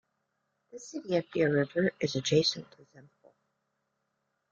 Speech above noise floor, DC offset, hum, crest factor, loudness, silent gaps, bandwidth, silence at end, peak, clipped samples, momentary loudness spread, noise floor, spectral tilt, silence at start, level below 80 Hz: 50 dB; under 0.1%; none; 20 dB; -29 LUFS; none; 7.6 kHz; 1.5 s; -12 dBFS; under 0.1%; 15 LU; -80 dBFS; -5 dB/octave; 0.75 s; -72 dBFS